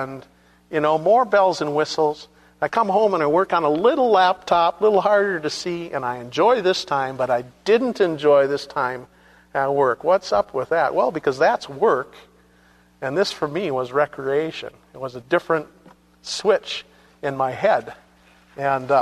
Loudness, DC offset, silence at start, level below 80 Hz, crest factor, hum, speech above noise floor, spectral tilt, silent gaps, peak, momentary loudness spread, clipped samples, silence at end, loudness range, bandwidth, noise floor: -20 LUFS; under 0.1%; 0 s; -60 dBFS; 16 dB; 60 Hz at -60 dBFS; 35 dB; -5 dB/octave; none; -4 dBFS; 12 LU; under 0.1%; 0 s; 6 LU; 13 kHz; -55 dBFS